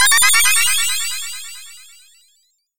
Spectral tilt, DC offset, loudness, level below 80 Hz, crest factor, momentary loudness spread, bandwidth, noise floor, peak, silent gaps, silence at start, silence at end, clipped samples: 4.5 dB/octave; under 0.1%; -13 LUFS; -54 dBFS; 18 dB; 21 LU; 17 kHz; -61 dBFS; 0 dBFS; none; 0 s; 0 s; under 0.1%